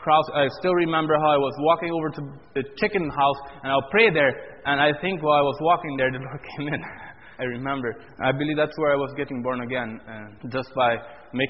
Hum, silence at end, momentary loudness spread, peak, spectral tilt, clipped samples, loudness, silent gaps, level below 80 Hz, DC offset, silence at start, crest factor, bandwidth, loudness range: none; 0 s; 13 LU; -4 dBFS; -3.5 dB/octave; under 0.1%; -23 LUFS; none; -56 dBFS; 0.2%; 0 s; 20 dB; 5.8 kHz; 5 LU